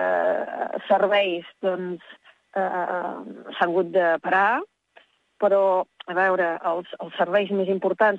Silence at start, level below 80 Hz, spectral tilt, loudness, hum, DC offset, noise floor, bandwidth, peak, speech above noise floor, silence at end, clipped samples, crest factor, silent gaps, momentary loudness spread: 0 s; -78 dBFS; -7 dB/octave; -23 LUFS; none; under 0.1%; -57 dBFS; 7.4 kHz; -8 dBFS; 35 dB; 0 s; under 0.1%; 16 dB; none; 12 LU